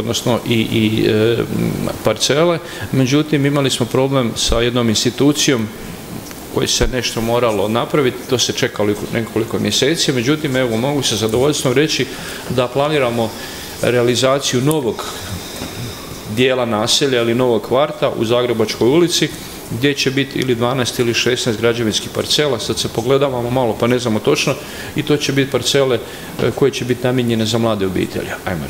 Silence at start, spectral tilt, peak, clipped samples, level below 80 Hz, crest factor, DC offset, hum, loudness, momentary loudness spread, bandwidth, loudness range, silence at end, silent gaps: 0 s; -4.5 dB/octave; 0 dBFS; under 0.1%; -38 dBFS; 16 dB; under 0.1%; none; -16 LUFS; 9 LU; 16.5 kHz; 2 LU; 0 s; none